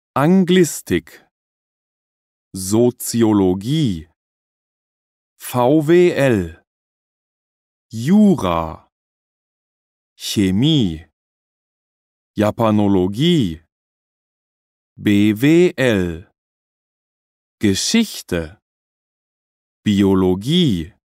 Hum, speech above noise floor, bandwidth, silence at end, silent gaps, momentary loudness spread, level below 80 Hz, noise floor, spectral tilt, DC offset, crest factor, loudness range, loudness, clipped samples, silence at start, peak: none; over 75 dB; 16 kHz; 0.25 s; 1.31-2.51 s, 4.16-5.36 s, 6.67-7.90 s, 8.92-10.16 s, 11.13-12.34 s, 13.72-14.96 s, 16.38-17.58 s, 18.62-19.83 s; 14 LU; -48 dBFS; under -90 dBFS; -5.5 dB/octave; under 0.1%; 16 dB; 5 LU; -16 LUFS; under 0.1%; 0.15 s; -2 dBFS